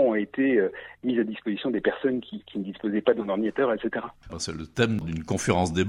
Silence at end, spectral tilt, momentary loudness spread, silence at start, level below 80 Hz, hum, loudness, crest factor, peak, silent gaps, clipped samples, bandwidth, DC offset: 0 s; -5.5 dB/octave; 10 LU; 0 s; -52 dBFS; none; -27 LUFS; 18 dB; -8 dBFS; none; under 0.1%; 15.5 kHz; under 0.1%